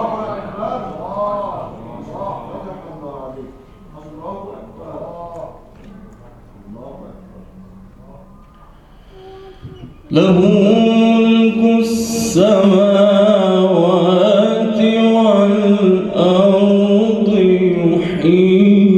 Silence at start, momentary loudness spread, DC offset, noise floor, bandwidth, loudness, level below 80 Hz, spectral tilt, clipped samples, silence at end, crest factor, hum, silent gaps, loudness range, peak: 0 s; 21 LU; under 0.1%; -42 dBFS; 13.5 kHz; -13 LUFS; -46 dBFS; -6.5 dB/octave; under 0.1%; 0 s; 14 dB; none; none; 21 LU; 0 dBFS